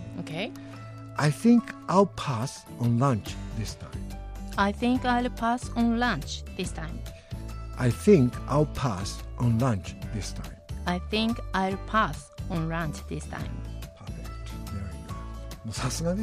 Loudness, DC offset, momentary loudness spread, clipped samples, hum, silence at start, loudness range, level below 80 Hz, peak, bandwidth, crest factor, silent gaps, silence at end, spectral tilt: -28 LUFS; under 0.1%; 16 LU; under 0.1%; none; 0 s; 6 LU; -40 dBFS; -6 dBFS; 15.5 kHz; 20 dB; none; 0 s; -6 dB/octave